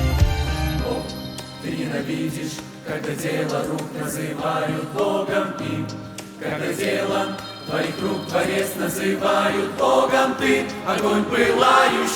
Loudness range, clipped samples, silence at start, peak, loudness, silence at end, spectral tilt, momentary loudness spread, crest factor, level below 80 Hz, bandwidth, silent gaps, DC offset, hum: 7 LU; under 0.1%; 0 s; -2 dBFS; -22 LUFS; 0 s; -5 dB/octave; 13 LU; 20 dB; -36 dBFS; over 20 kHz; none; under 0.1%; none